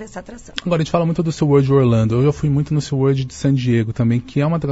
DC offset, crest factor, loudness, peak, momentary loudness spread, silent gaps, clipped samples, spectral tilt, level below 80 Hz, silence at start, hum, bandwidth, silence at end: under 0.1%; 16 dB; -17 LUFS; 0 dBFS; 6 LU; none; under 0.1%; -7.5 dB/octave; -42 dBFS; 0 s; none; 8 kHz; 0 s